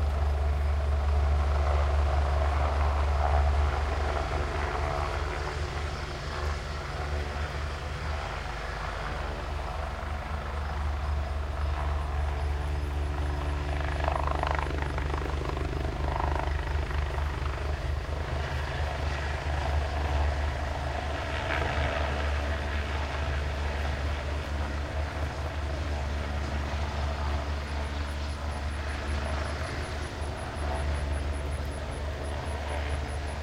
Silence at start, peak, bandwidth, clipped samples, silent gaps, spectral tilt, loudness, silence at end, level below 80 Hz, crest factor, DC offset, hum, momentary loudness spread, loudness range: 0 s; -10 dBFS; 11 kHz; under 0.1%; none; -6 dB/octave; -31 LUFS; 0 s; -32 dBFS; 20 dB; 0.1%; none; 7 LU; 6 LU